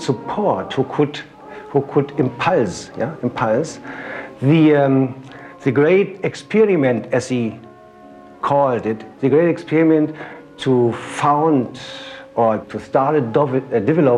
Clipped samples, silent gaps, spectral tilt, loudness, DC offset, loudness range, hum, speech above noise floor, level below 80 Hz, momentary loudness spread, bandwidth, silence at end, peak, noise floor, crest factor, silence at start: under 0.1%; none; -7 dB/octave; -18 LUFS; under 0.1%; 4 LU; none; 25 dB; -58 dBFS; 15 LU; 10.5 kHz; 0 s; -2 dBFS; -42 dBFS; 16 dB; 0 s